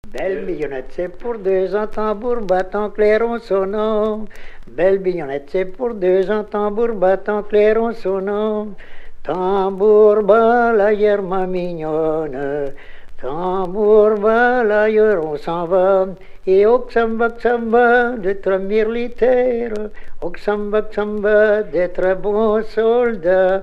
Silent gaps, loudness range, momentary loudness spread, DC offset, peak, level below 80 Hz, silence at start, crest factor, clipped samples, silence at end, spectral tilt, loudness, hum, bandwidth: none; 4 LU; 12 LU; under 0.1%; 0 dBFS; -36 dBFS; 0.05 s; 16 dB; under 0.1%; 0 s; -7.5 dB/octave; -17 LUFS; none; 6 kHz